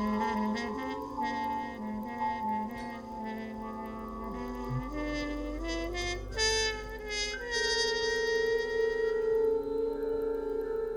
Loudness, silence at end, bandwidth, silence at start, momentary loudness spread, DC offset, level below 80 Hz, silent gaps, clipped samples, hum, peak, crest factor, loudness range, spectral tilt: -33 LUFS; 0 s; 17.5 kHz; 0 s; 11 LU; under 0.1%; -46 dBFS; none; under 0.1%; none; -18 dBFS; 14 dB; 7 LU; -3.5 dB/octave